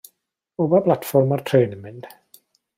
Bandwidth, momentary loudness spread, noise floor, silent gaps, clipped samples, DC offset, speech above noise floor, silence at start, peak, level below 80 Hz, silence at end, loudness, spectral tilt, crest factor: 16 kHz; 20 LU; -66 dBFS; none; under 0.1%; under 0.1%; 47 dB; 0.6 s; -4 dBFS; -66 dBFS; 0.7 s; -19 LUFS; -7.5 dB/octave; 18 dB